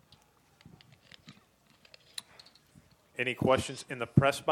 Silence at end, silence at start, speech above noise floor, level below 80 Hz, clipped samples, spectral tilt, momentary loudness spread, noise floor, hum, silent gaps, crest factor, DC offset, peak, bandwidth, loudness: 0 s; 1.3 s; 36 dB; -60 dBFS; under 0.1%; -5.5 dB/octave; 27 LU; -65 dBFS; none; none; 26 dB; under 0.1%; -8 dBFS; 16.5 kHz; -30 LUFS